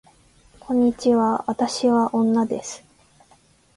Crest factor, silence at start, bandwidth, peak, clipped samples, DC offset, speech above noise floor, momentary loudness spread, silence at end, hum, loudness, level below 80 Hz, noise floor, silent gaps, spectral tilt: 16 dB; 0.7 s; 11.5 kHz; -8 dBFS; under 0.1%; under 0.1%; 37 dB; 10 LU; 1 s; none; -21 LUFS; -58 dBFS; -57 dBFS; none; -5 dB/octave